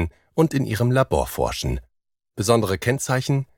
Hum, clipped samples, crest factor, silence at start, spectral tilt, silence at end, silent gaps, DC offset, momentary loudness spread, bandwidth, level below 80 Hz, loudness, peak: none; under 0.1%; 18 dB; 0 s; -5.5 dB/octave; 0.15 s; none; under 0.1%; 8 LU; 18.5 kHz; -38 dBFS; -22 LUFS; -4 dBFS